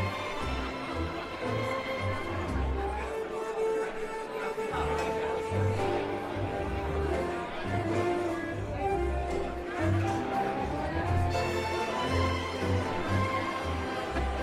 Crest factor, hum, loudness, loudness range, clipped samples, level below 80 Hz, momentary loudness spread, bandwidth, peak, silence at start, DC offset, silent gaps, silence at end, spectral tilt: 14 dB; none; -32 LUFS; 3 LU; under 0.1%; -42 dBFS; 5 LU; 14.5 kHz; -16 dBFS; 0 s; under 0.1%; none; 0 s; -6 dB/octave